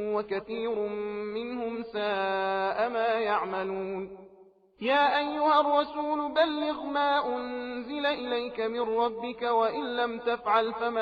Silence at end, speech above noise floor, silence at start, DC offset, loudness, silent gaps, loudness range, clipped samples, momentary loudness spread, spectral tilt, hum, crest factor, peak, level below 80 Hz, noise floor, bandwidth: 0 s; 29 dB; 0 s; under 0.1%; -29 LUFS; none; 3 LU; under 0.1%; 10 LU; -6 dB/octave; none; 16 dB; -12 dBFS; -66 dBFS; -57 dBFS; 6.4 kHz